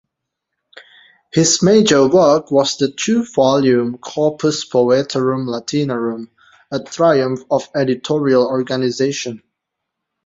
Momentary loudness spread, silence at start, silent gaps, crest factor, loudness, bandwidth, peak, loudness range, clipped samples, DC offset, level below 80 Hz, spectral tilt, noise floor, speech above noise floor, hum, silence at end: 11 LU; 1.35 s; none; 16 dB; -16 LUFS; 7.8 kHz; 0 dBFS; 5 LU; under 0.1%; under 0.1%; -56 dBFS; -4.5 dB/octave; -78 dBFS; 63 dB; none; 0.9 s